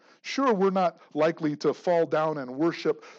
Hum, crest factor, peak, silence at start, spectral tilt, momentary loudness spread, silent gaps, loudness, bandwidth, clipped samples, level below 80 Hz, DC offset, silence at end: none; 14 dB; -12 dBFS; 0.25 s; -6.5 dB/octave; 5 LU; none; -26 LUFS; 7.8 kHz; under 0.1%; under -90 dBFS; under 0.1%; 0.05 s